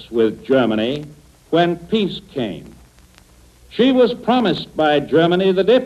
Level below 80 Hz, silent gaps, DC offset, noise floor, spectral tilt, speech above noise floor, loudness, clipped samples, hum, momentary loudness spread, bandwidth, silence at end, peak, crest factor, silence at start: -50 dBFS; none; under 0.1%; -48 dBFS; -7 dB/octave; 32 dB; -17 LUFS; under 0.1%; 60 Hz at -55 dBFS; 11 LU; 13 kHz; 0 s; -4 dBFS; 14 dB; 0 s